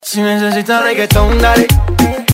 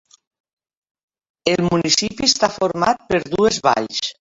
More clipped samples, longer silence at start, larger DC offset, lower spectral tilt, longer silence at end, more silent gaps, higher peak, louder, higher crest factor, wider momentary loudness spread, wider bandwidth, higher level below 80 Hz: neither; second, 0.05 s vs 1.45 s; neither; first, -5 dB/octave vs -3.5 dB/octave; second, 0 s vs 0.25 s; neither; about the same, 0 dBFS vs 0 dBFS; first, -11 LUFS vs -18 LUFS; second, 10 dB vs 20 dB; about the same, 4 LU vs 6 LU; first, 16.5 kHz vs 8 kHz; first, -18 dBFS vs -50 dBFS